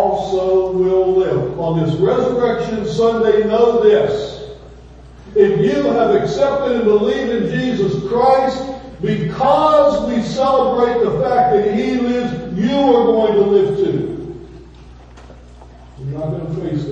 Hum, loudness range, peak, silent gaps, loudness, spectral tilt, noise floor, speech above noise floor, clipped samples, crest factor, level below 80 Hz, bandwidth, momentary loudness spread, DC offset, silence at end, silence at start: 60 Hz at -40 dBFS; 2 LU; 0 dBFS; none; -15 LUFS; -7 dB/octave; -39 dBFS; 24 dB; under 0.1%; 16 dB; -42 dBFS; 8 kHz; 11 LU; under 0.1%; 0 s; 0 s